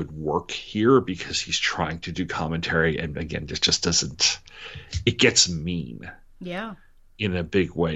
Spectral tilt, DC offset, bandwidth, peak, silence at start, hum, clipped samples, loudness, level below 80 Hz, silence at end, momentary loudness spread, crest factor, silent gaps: -3.5 dB/octave; under 0.1%; 8.4 kHz; -2 dBFS; 0 s; none; under 0.1%; -23 LUFS; -48 dBFS; 0 s; 15 LU; 22 dB; none